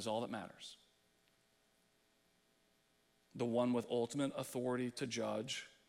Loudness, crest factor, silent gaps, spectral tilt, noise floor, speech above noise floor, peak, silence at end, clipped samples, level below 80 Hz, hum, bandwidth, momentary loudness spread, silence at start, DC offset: -40 LUFS; 18 dB; none; -5 dB/octave; -76 dBFS; 36 dB; -24 dBFS; 0.2 s; under 0.1%; -82 dBFS; none; 15.5 kHz; 15 LU; 0 s; under 0.1%